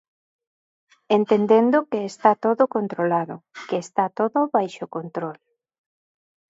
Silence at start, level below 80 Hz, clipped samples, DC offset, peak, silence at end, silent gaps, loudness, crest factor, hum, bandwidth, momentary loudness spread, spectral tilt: 1.1 s; -76 dBFS; under 0.1%; under 0.1%; -2 dBFS; 1.15 s; none; -21 LUFS; 20 dB; none; 8 kHz; 14 LU; -6.5 dB/octave